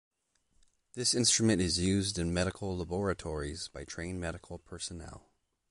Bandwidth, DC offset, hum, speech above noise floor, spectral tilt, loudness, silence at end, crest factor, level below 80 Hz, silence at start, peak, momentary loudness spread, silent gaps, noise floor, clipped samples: 11.5 kHz; under 0.1%; none; 40 dB; -3.5 dB/octave; -32 LUFS; 0.5 s; 20 dB; -48 dBFS; 0.95 s; -14 dBFS; 18 LU; none; -72 dBFS; under 0.1%